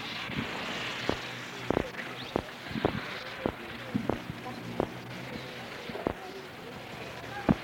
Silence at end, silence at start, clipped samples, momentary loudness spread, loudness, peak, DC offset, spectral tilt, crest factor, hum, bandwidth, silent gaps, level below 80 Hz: 0 s; 0 s; under 0.1%; 9 LU; -36 LUFS; -10 dBFS; under 0.1%; -5.5 dB/octave; 26 dB; none; 19.5 kHz; none; -54 dBFS